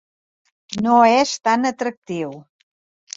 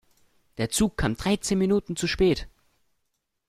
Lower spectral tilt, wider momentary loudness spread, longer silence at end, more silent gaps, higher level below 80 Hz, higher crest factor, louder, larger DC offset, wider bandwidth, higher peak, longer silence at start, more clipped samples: about the same, -4 dB/octave vs -4.5 dB/octave; first, 15 LU vs 7 LU; second, 0.75 s vs 1 s; first, 1.97-2.02 s vs none; second, -64 dBFS vs -42 dBFS; about the same, 18 dB vs 16 dB; first, -18 LUFS vs -25 LUFS; neither; second, 7.8 kHz vs 15.5 kHz; first, -2 dBFS vs -10 dBFS; about the same, 0.7 s vs 0.6 s; neither